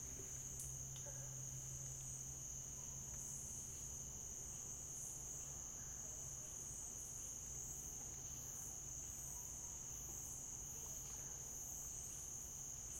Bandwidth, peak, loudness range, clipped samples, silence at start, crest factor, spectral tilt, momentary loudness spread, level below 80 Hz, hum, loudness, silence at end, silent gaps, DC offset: 16.5 kHz; -30 dBFS; 0 LU; under 0.1%; 0 s; 22 dB; -2.5 dB/octave; 1 LU; -64 dBFS; none; -48 LUFS; 0 s; none; under 0.1%